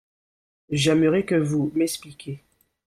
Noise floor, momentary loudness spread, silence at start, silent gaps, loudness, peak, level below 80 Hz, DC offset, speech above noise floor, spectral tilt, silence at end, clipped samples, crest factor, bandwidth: under -90 dBFS; 18 LU; 0.7 s; none; -22 LUFS; -8 dBFS; -58 dBFS; under 0.1%; over 68 dB; -5.5 dB/octave; 0.5 s; under 0.1%; 16 dB; 15 kHz